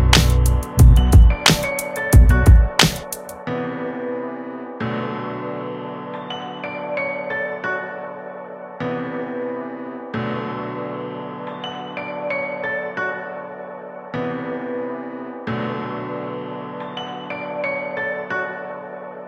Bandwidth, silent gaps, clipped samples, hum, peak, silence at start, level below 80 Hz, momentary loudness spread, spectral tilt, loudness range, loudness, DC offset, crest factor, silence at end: 16 kHz; none; under 0.1%; none; 0 dBFS; 0 s; -22 dBFS; 17 LU; -5 dB/octave; 12 LU; -21 LUFS; under 0.1%; 20 dB; 0 s